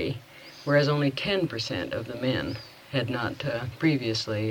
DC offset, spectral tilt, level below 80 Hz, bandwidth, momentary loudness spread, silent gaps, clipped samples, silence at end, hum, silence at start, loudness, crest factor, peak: under 0.1%; -6 dB/octave; -56 dBFS; 19 kHz; 11 LU; none; under 0.1%; 0 s; none; 0 s; -28 LUFS; 18 dB; -10 dBFS